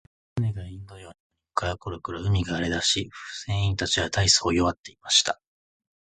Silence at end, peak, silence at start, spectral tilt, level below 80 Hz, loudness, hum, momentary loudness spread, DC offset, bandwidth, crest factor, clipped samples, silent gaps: 0.7 s; -6 dBFS; 0.35 s; -3 dB/octave; -42 dBFS; -24 LUFS; none; 16 LU; under 0.1%; 9.6 kHz; 22 dB; under 0.1%; 1.20-1.30 s, 4.79-4.84 s